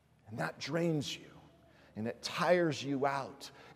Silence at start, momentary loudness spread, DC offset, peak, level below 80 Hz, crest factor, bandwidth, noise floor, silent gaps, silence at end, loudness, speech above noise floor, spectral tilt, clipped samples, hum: 0.25 s; 16 LU; under 0.1%; -16 dBFS; -74 dBFS; 20 dB; 15.5 kHz; -62 dBFS; none; 0 s; -35 LUFS; 27 dB; -5 dB/octave; under 0.1%; none